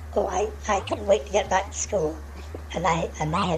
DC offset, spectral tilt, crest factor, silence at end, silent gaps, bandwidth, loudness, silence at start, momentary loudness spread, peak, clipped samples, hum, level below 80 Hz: under 0.1%; -4.5 dB/octave; 18 dB; 0 s; none; 14 kHz; -26 LUFS; 0 s; 10 LU; -8 dBFS; under 0.1%; none; -40 dBFS